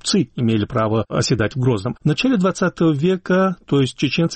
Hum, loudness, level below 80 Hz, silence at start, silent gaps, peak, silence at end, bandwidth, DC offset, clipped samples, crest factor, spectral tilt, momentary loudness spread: none; -19 LUFS; -46 dBFS; 0.05 s; none; -8 dBFS; 0 s; 8.8 kHz; under 0.1%; under 0.1%; 10 dB; -6 dB/octave; 2 LU